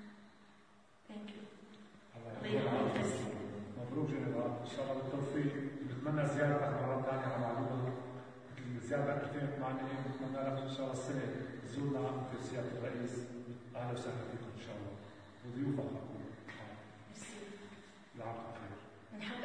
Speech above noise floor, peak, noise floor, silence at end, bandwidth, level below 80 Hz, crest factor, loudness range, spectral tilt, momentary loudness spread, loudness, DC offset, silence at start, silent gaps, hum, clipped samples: 26 dB; -20 dBFS; -66 dBFS; 0 s; 10.5 kHz; -74 dBFS; 20 dB; 8 LU; -6.5 dB/octave; 17 LU; -40 LUFS; under 0.1%; 0 s; none; none; under 0.1%